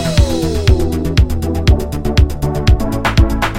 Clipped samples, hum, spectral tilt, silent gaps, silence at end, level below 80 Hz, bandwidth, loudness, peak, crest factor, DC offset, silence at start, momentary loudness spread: under 0.1%; none; -6 dB/octave; none; 0 s; -16 dBFS; 16 kHz; -15 LUFS; 0 dBFS; 12 dB; under 0.1%; 0 s; 2 LU